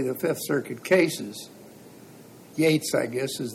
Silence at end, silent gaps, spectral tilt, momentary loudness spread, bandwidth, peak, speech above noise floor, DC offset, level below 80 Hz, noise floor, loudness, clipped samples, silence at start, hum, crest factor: 0 s; none; -4.5 dB/octave; 16 LU; 17 kHz; -8 dBFS; 23 dB; under 0.1%; -72 dBFS; -48 dBFS; -25 LUFS; under 0.1%; 0 s; none; 18 dB